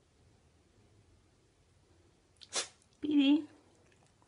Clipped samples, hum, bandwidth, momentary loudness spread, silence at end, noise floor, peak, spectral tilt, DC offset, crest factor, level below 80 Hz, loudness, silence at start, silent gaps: under 0.1%; none; 11 kHz; 17 LU; 0.8 s; -68 dBFS; -20 dBFS; -2.5 dB/octave; under 0.1%; 18 dB; -74 dBFS; -33 LUFS; 2.5 s; none